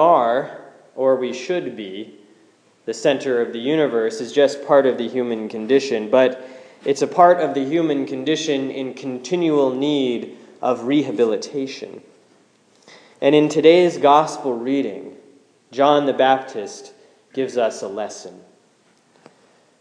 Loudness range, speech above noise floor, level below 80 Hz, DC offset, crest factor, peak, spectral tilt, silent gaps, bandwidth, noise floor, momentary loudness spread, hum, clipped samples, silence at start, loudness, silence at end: 6 LU; 39 dB; -78 dBFS; under 0.1%; 20 dB; 0 dBFS; -5 dB/octave; none; 10.5 kHz; -58 dBFS; 19 LU; none; under 0.1%; 0 s; -19 LUFS; 1.45 s